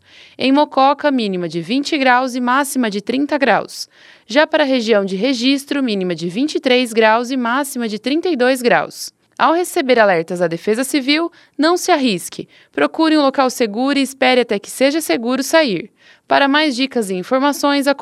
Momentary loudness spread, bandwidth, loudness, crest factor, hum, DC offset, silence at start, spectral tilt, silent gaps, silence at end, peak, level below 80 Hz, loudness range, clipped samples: 7 LU; 15 kHz; -16 LUFS; 16 dB; none; under 0.1%; 0.4 s; -4 dB/octave; none; 0 s; 0 dBFS; -70 dBFS; 1 LU; under 0.1%